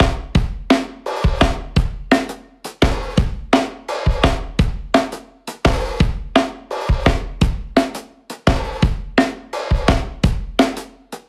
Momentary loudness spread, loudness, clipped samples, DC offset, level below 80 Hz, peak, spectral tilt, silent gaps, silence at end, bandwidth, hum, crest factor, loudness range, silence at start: 9 LU; -19 LUFS; under 0.1%; under 0.1%; -24 dBFS; 0 dBFS; -6 dB/octave; none; 0.1 s; 14 kHz; none; 18 dB; 1 LU; 0 s